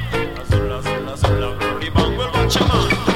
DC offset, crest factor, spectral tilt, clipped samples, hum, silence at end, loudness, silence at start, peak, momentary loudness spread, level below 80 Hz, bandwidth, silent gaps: under 0.1%; 16 dB; -5.5 dB/octave; under 0.1%; none; 0 s; -19 LUFS; 0 s; -2 dBFS; 7 LU; -26 dBFS; 16.5 kHz; none